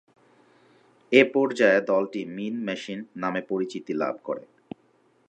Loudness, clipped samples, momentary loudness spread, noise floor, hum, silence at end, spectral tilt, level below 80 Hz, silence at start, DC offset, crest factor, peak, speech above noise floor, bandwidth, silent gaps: -25 LUFS; under 0.1%; 17 LU; -63 dBFS; none; 0.9 s; -5.5 dB/octave; -78 dBFS; 1.1 s; under 0.1%; 22 dB; -4 dBFS; 39 dB; 9.2 kHz; none